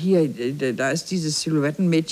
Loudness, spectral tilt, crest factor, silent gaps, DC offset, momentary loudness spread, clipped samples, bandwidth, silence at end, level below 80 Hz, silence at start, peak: -22 LUFS; -5 dB/octave; 14 dB; none; under 0.1%; 4 LU; under 0.1%; 14.5 kHz; 0 s; -64 dBFS; 0 s; -8 dBFS